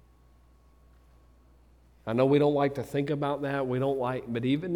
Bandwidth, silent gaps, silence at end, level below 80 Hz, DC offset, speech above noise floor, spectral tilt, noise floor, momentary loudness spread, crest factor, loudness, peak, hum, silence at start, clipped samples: 14.5 kHz; none; 0 s; -60 dBFS; under 0.1%; 32 dB; -8 dB/octave; -59 dBFS; 8 LU; 18 dB; -28 LUFS; -12 dBFS; none; 2.05 s; under 0.1%